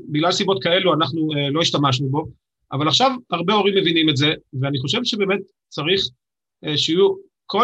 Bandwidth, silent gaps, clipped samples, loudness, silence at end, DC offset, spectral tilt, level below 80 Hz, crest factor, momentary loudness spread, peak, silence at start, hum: 8.6 kHz; none; under 0.1%; -19 LUFS; 0 s; under 0.1%; -5 dB/octave; -60 dBFS; 16 dB; 9 LU; -4 dBFS; 0 s; none